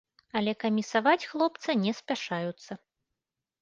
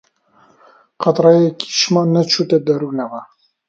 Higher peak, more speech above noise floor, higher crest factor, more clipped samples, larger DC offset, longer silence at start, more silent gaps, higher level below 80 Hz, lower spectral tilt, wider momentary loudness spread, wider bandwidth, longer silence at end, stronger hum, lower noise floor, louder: second, -10 dBFS vs 0 dBFS; first, 59 dB vs 39 dB; about the same, 20 dB vs 16 dB; neither; neither; second, 0.35 s vs 1 s; neither; second, -74 dBFS vs -64 dBFS; about the same, -5 dB/octave vs -5 dB/octave; about the same, 13 LU vs 12 LU; about the same, 7.6 kHz vs 7.8 kHz; first, 0.85 s vs 0.45 s; neither; first, -87 dBFS vs -53 dBFS; second, -29 LUFS vs -15 LUFS